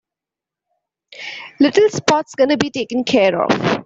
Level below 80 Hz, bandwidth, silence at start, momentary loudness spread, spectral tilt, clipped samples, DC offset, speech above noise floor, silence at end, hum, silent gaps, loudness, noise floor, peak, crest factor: -58 dBFS; 8 kHz; 1.1 s; 16 LU; -4.5 dB/octave; under 0.1%; under 0.1%; 71 dB; 0 s; none; none; -16 LUFS; -87 dBFS; -2 dBFS; 16 dB